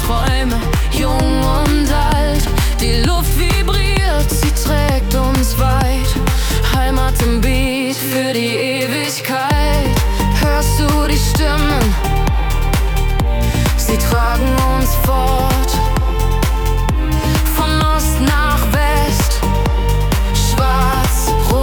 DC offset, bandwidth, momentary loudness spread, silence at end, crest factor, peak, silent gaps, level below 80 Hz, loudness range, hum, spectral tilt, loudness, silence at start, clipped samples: under 0.1%; over 20 kHz; 3 LU; 0 s; 12 dB; 0 dBFS; none; -16 dBFS; 1 LU; none; -5 dB/octave; -15 LUFS; 0 s; under 0.1%